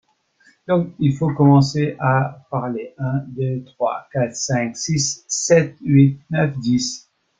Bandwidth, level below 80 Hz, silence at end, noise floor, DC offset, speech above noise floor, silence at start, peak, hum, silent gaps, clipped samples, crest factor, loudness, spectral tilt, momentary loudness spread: 9.2 kHz; -54 dBFS; 0.4 s; -57 dBFS; under 0.1%; 39 dB; 0.7 s; -2 dBFS; none; none; under 0.1%; 18 dB; -19 LUFS; -5.5 dB/octave; 10 LU